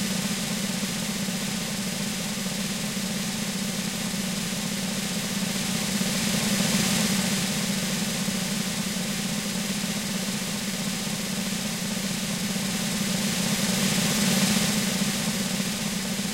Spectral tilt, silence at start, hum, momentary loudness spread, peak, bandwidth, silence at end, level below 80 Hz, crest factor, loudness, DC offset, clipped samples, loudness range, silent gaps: -3 dB/octave; 0 s; none; 5 LU; -10 dBFS; 16 kHz; 0 s; -52 dBFS; 16 dB; -26 LUFS; 0.1%; under 0.1%; 4 LU; none